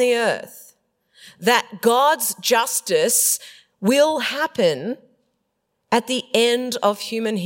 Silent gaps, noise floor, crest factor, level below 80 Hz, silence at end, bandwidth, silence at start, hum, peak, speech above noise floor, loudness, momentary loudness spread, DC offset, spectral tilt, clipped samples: none; -73 dBFS; 20 dB; -74 dBFS; 0 s; 16.5 kHz; 0 s; none; -2 dBFS; 54 dB; -19 LUFS; 8 LU; under 0.1%; -2 dB/octave; under 0.1%